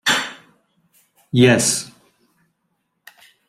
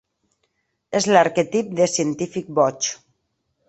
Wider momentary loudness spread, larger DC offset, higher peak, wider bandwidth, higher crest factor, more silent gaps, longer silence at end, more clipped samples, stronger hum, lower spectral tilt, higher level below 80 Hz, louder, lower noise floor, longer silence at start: first, 17 LU vs 10 LU; neither; about the same, -2 dBFS vs -2 dBFS; first, 15.5 kHz vs 8.4 kHz; about the same, 20 dB vs 20 dB; neither; first, 1.6 s vs 0.75 s; neither; neither; about the same, -3.5 dB/octave vs -4 dB/octave; first, -58 dBFS vs -64 dBFS; first, -16 LUFS vs -20 LUFS; about the same, -71 dBFS vs -73 dBFS; second, 0.05 s vs 0.9 s